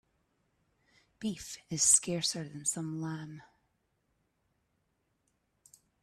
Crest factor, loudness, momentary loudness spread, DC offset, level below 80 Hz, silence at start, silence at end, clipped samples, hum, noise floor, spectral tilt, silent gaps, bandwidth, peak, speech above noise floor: 26 dB; -30 LUFS; 19 LU; under 0.1%; -70 dBFS; 1.2 s; 2.6 s; under 0.1%; none; -78 dBFS; -2.5 dB/octave; none; 15.5 kHz; -10 dBFS; 45 dB